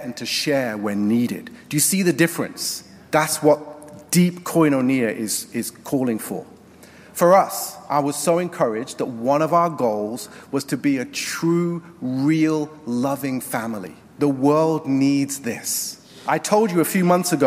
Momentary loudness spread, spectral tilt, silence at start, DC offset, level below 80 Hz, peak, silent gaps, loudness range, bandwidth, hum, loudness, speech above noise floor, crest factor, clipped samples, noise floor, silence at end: 10 LU; -4.5 dB/octave; 0 s; under 0.1%; -64 dBFS; -4 dBFS; none; 3 LU; 16 kHz; none; -21 LUFS; 25 dB; 18 dB; under 0.1%; -46 dBFS; 0 s